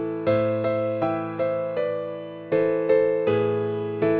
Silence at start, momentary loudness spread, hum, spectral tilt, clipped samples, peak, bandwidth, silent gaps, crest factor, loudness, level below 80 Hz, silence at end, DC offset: 0 s; 7 LU; none; -10 dB/octave; under 0.1%; -8 dBFS; 4.6 kHz; none; 14 dB; -24 LUFS; -62 dBFS; 0 s; under 0.1%